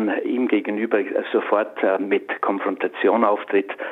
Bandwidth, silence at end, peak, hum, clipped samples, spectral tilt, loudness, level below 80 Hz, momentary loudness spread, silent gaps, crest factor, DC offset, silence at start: 4.1 kHz; 0 s; -2 dBFS; none; under 0.1%; -7.5 dB/octave; -21 LUFS; -76 dBFS; 4 LU; none; 18 dB; under 0.1%; 0 s